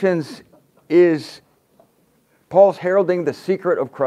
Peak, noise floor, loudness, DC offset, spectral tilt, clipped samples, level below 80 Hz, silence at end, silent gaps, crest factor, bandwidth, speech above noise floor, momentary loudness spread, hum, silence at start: 0 dBFS; -60 dBFS; -18 LUFS; under 0.1%; -7.5 dB/octave; under 0.1%; -68 dBFS; 0 s; none; 18 dB; 11 kHz; 43 dB; 10 LU; none; 0 s